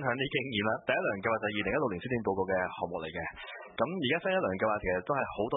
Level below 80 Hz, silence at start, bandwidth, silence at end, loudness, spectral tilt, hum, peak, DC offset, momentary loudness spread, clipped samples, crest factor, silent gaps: -58 dBFS; 0 s; 3.9 kHz; 0 s; -32 LUFS; -1.5 dB/octave; none; -14 dBFS; under 0.1%; 7 LU; under 0.1%; 18 dB; none